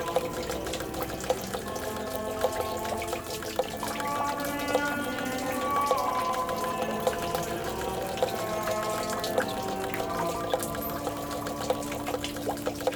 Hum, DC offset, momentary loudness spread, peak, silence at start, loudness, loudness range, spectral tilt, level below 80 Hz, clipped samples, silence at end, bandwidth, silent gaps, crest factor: none; under 0.1%; 5 LU; -10 dBFS; 0 s; -31 LUFS; 3 LU; -4 dB/octave; -50 dBFS; under 0.1%; 0 s; over 20 kHz; none; 20 dB